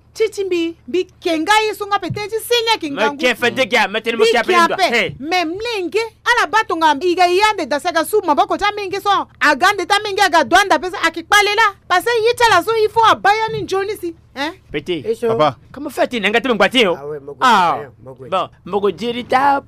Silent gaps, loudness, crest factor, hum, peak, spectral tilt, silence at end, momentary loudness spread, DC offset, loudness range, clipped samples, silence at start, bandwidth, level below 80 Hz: none; -15 LUFS; 14 dB; none; -2 dBFS; -3 dB/octave; 0.05 s; 10 LU; under 0.1%; 4 LU; under 0.1%; 0.15 s; 16 kHz; -50 dBFS